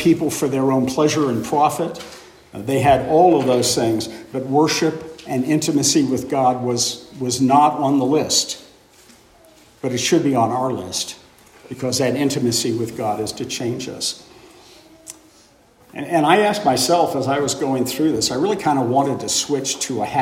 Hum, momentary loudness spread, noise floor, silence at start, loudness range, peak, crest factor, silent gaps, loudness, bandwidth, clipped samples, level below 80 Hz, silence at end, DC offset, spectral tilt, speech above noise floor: none; 12 LU; -52 dBFS; 0 s; 5 LU; -2 dBFS; 18 dB; none; -19 LUFS; 16.5 kHz; under 0.1%; -54 dBFS; 0 s; under 0.1%; -4 dB/octave; 33 dB